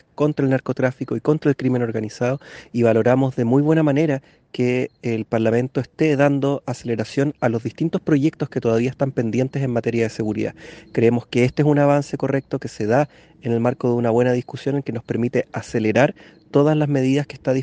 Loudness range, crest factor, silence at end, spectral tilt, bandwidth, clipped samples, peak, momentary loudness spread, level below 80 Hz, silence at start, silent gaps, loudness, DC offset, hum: 2 LU; 20 dB; 0 s; -7.5 dB/octave; 9.2 kHz; under 0.1%; 0 dBFS; 8 LU; -56 dBFS; 0.2 s; none; -20 LUFS; under 0.1%; none